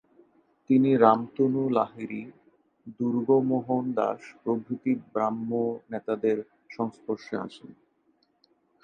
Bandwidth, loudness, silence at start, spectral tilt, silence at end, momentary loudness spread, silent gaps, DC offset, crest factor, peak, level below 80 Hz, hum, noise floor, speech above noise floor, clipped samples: 7 kHz; -27 LUFS; 0.7 s; -9 dB/octave; 1.1 s; 14 LU; none; under 0.1%; 24 dB; -4 dBFS; -74 dBFS; none; -69 dBFS; 43 dB; under 0.1%